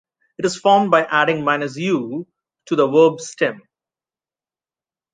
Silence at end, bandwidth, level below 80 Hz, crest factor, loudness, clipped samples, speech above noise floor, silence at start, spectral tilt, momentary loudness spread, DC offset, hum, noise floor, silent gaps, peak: 1.55 s; 9.4 kHz; -68 dBFS; 18 dB; -18 LUFS; under 0.1%; over 73 dB; 0.4 s; -5 dB/octave; 10 LU; under 0.1%; none; under -90 dBFS; none; -2 dBFS